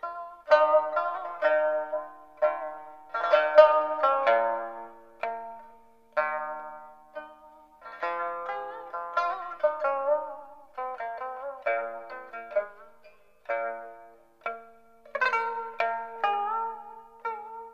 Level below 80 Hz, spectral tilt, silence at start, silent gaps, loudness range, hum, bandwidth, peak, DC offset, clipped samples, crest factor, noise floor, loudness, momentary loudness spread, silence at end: -72 dBFS; -3 dB/octave; 0.05 s; none; 11 LU; none; 6.8 kHz; -2 dBFS; 0.1%; under 0.1%; 26 dB; -58 dBFS; -28 LUFS; 21 LU; 0 s